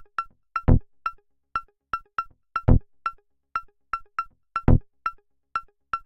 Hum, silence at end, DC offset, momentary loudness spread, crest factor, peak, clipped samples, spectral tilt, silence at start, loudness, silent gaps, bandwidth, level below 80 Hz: none; 0.1 s; under 0.1%; 11 LU; 20 dB; -4 dBFS; under 0.1%; -9.5 dB/octave; 0.2 s; -28 LUFS; none; 5.8 kHz; -30 dBFS